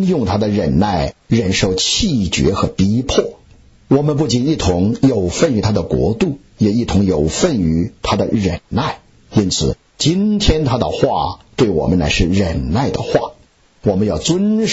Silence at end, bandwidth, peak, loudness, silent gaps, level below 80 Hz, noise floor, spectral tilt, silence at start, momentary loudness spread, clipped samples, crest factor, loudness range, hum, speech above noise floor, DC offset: 0 s; 8 kHz; -2 dBFS; -16 LUFS; none; -30 dBFS; -46 dBFS; -5.5 dB/octave; 0 s; 5 LU; under 0.1%; 14 dB; 1 LU; none; 31 dB; under 0.1%